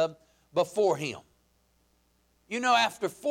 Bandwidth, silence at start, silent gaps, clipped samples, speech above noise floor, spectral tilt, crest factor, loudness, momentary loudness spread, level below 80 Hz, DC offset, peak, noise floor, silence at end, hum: 16.5 kHz; 0 s; none; under 0.1%; 42 dB; -3.5 dB/octave; 18 dB; -28 LUFS; 13 LU; -72 dBFS; under 0.1%; -12 dBFS; -69 dBFS; 0 s; none